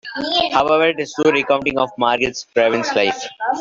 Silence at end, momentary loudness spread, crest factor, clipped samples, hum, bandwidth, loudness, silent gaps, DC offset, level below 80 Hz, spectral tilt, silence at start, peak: 0 s; 5 LU; 16 dB; under 0.1%; none; 7.6 kHz; -17 LUFS; none; under 0.1%; -52 dBFS; -3.5 dB/octave; 0.05 s; -2 dBFS